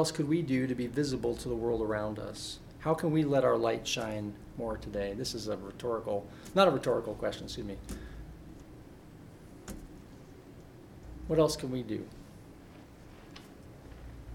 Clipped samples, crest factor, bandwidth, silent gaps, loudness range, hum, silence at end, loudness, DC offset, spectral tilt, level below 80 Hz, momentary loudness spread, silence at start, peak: under 0.1%; 24 dB; 16.5 kHz; none; 12 LU; none; 0 s; -32 LUFS; under 0.1%; -5.5 dB/octave; -52 dBFS; 24 LU; 0 s; -10 dBFS